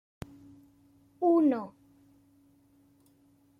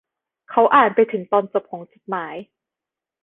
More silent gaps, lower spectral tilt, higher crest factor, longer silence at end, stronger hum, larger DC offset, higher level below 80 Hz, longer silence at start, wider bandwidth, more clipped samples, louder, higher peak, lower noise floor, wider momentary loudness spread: neither; about the same, -8.5 dB/octave vs -8.5 dB/octave; about the same, 18 dB vs 20 dB; first, 1.9 s vs 0.8 s; first, 50 Hz at -70 dBFS vs none; neither; about the same, -68 dBFS vs -64 dBFS; first, 1.2 s vs 0.5 s; first, 5.2 kHz vs 4 kHz; neither; second, -27 LUFS vs -19 LUFS; second, -16 dBFS vs -2 dBFS; second, -65 dBFS vs -87 dBFS; first, 24 LU vs 21 LU